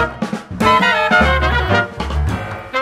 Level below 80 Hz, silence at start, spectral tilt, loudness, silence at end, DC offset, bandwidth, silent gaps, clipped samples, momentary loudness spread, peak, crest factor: -24 dBFS; 0 s; -5.5 dB/octave; -15 LUFS; 0 s; under 0.1%; 14 kHz; none; under 0.1%; 11 LU; 0 dBFS; 16 dB